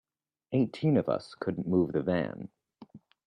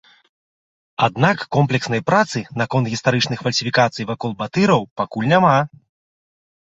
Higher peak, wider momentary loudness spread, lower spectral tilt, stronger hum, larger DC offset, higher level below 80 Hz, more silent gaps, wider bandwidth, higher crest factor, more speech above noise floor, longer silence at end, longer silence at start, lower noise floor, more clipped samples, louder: second, -14 dBFS vs 0 dBFS; about the same, 10 LU vs 9 LU; first, -9 dB/octave vs -5.5 dB/octave; neither; neither; second, -66 dBFS vs -56 dBFS; second, none vs 4.91-4.96 s; first, 9.8 kHz vs 8.2 kHz; about the same, 18 dB vs 18 dB; second, 25 dB vs over 72 dB; second, 0.3 s vs 1 s; second, 0.5 s vs 1 s; second, -54 dBFS vs under -90 dBFS; neither; second, -30 LUFS vs -18 LUFS